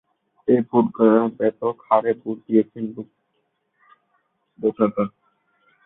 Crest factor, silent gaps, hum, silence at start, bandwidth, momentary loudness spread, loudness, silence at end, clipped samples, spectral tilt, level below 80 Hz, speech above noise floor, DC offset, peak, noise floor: 20 dB; none; none; 0.45 s; 3.9 kHz; 13 LU; -21 LUFS; 0.8 s; under 0.1%; -12.5 dB/octave; -66 dBFS; 52 dB; under 0.1%; -2 dBFS; -71 dBFS